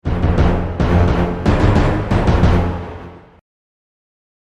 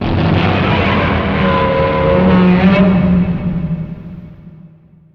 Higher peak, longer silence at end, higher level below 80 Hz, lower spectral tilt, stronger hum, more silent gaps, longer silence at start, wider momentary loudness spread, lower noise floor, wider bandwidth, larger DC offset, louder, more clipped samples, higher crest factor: about the same, 0 dBFS vs 0 dBFS; first, 1.3 s vs 0.45 s; first, -22 dBFS vs -28 dBFS; about the same, -8 dB/octave vs -9 dB/octave; neither; neither; about the same, 0.05 s vs 0 s; second, 9 LU vs 13 LU; second, -34 dBFS vs -42 dBFS; first, 8.4 kHz vs 5.8 kHz; neither; second, -16 LUFS vs -12 LUFS; neither; about the same, 16 dB vs 12 dB